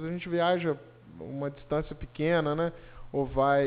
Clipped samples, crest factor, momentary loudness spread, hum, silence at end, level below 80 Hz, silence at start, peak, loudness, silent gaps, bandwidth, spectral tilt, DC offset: under 0.1%; 16 dB; 14 LU; none; 0 s; -50 dBFS; 0 s; -14 dBFS; -30 LUFS; none; 5 kHz; -5 dB/octave; under 0.1%